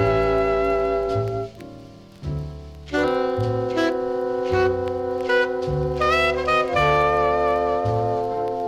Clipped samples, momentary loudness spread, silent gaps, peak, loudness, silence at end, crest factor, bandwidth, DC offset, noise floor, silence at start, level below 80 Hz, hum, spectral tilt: under 0.1%; 12 LU; none; -8 dBFS; -22 LUFS; 0 s; 14 dB; 12.5 kHz; under 0.1%; -42 dBFS; 0 s; -40 dBFS; none; -6.5 dB/octave